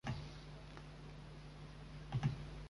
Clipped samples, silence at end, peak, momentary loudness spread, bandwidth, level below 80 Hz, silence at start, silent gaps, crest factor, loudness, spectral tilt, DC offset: under 0.1%; 0 s; -26 dBFS; 13 LU; 11.5 kHz; -56 dBFS; 0.05 s; none; 22 dB; -48 LUFS; -6.5 dB/octave; under 0.1%